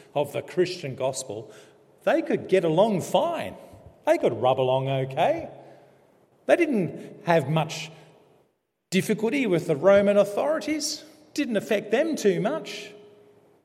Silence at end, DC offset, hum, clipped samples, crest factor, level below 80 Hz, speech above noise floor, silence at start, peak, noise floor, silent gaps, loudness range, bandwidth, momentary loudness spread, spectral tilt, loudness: 0.65 s; under 0.1%; none; under 0.1%; 20 dB; -70 dBFS; 48 dB; 0.15 s; -4 dBFS; -71 dBFS; none; 3 LU; 16 kHz; 13 LU; -5.5 dB/octave; -24 LUFS